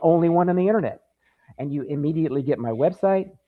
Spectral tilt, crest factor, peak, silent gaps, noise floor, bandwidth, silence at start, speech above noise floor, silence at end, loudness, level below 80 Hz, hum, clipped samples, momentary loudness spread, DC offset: -11 dB/octave; 16 dB; -6 dBFS; none; -56 dBFS; 4.7 kHz; 0 s; 34 dB; 0.2 s; -22 LUFS; -62 dBFS; none; under 0.1%; 11 LU; under 0.1%